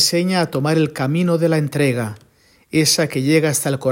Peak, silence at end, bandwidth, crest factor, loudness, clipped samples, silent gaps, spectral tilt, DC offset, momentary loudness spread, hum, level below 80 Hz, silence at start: -2 dBFS; 0 s; 16.5 kHz; 16 dB; -17 LUFS; under 0.1%; none; -4.5 dB/octave; under 0.1%; 4 LU; none; -58 dBFS; 0 s